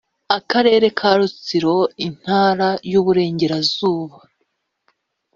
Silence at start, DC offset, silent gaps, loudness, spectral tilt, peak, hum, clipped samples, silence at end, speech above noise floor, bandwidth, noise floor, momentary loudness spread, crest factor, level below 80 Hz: 0.3 s; under 0.1%; none; -17 LUFS; -3.5 dB/octave; 0 dBFS; none; under 0.1%; 1.3 s; 54 dB; 7.4 kHz; -70 dBFS; 7 LU; 18 dB; -58 dBFS